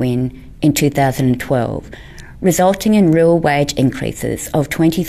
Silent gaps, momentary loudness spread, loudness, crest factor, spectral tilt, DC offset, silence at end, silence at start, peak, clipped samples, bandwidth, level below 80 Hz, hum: none; 11 LU; -15 LUFS; 12 dB; -6 dB/octave; under 0.1%; 0 s; 0 s; -2 dBFS; under 0.1%; 15.5 kHz; -38 dBFS; none